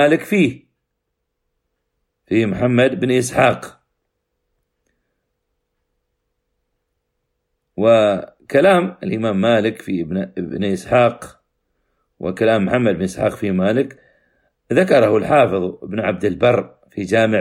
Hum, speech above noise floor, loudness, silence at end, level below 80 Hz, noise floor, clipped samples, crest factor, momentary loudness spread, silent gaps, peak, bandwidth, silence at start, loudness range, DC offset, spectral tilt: none; 59 dB; -17 LUFS; 0 s; -52 dBFS; -75 dBFS; under 0.1%; 16 dB; 11 LU; none; -2 dBFS; 15 kHz; 0 s; 5 LU; under 0.1%; -6 dB/octave